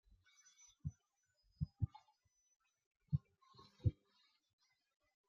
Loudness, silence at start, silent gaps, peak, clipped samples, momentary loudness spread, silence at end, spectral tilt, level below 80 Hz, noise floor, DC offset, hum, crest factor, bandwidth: -46 LUFS; 0.85 s; 2.56-2.60 s, 2.86-2.91 s; -24 dBFS; under 0.1%; 23 LU; 1.35 s; -9.5 dB/octave; -62 dBFS; -84 dBFS; under 0.1%; none; 26 dB; 7 kHz